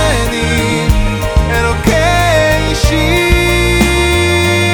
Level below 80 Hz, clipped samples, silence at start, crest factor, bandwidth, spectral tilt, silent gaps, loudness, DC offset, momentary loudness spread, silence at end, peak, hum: -18 dBFS; under 0.1%; 0 s; 10 dB; over 20 kHz; -4.5 dB/octave; none; -11 LUFS; under 0.1%; 4 LU; 0 s; 0 dBFS; none